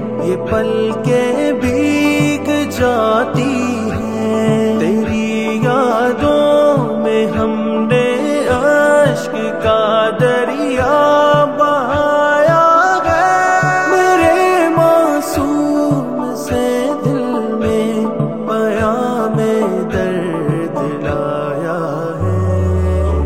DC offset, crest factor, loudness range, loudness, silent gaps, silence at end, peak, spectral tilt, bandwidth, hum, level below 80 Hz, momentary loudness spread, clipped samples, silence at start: 0.7%; 14 dB; 5 LU; -14 LUFS; none; 0 s; 0 dBFS; -6 dB/octave; 16 kHz; none; -34 dBFS; 7 LU; under 0.1%; 0 s